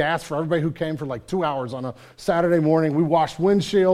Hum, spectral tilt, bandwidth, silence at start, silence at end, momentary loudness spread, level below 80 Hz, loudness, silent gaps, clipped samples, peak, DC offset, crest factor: none; -7 dB/octave; 14 kHz; 0 s; 0 s; 11 LU; -54 dBFS; -22 LUFS; none; under 0.1%; -6 dBFS; under 0.1%; 14 dB